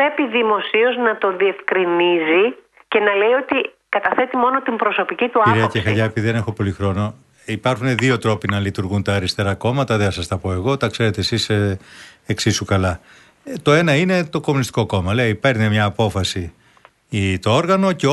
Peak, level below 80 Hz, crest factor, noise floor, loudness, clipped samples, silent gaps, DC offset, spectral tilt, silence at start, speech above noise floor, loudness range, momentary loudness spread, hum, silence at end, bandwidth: 0 dBFS; -48 dBFS; 18 dB; -52 dBFS; -18 LUFS; under 0.1%; none; under 0.1%; -5.5 dB/octave; 0 s; 34 dB; 3 LU; 8 LU; none; 0 s; 12 kHz